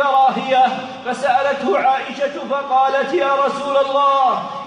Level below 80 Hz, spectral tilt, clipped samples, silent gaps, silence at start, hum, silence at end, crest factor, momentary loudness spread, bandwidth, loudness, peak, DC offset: -66 dBFS; -4 dB/octave; under 0.1%; none; 0 s; none; 0 s; 12 dB; 8 LU; 10.5 kHz; -17 LUFS; -4 dBFS; under 0.1%